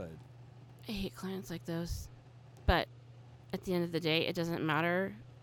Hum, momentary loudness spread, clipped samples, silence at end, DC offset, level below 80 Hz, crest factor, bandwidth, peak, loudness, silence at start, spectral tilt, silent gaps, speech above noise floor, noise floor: none; 23 LU; under 0.1%; 0.05 s; under 0.1%; -46 dBFS; 24 dB; 18.5 kHz; -14 dBFS; -35 LUFS; 0 s; -5.5 dB/octave; none; 21 dB; -55 dBFS